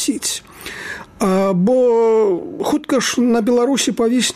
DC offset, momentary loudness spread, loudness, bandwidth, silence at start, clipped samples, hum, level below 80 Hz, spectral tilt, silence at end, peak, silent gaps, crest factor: under 0.1%; 14 LU; -16 LUFS; 15.5 kHz; 0 s; under 0.1%; none; -52 dBFS; -4.5 dB/octave; 0 s; -6 dBFS; none; 12 dB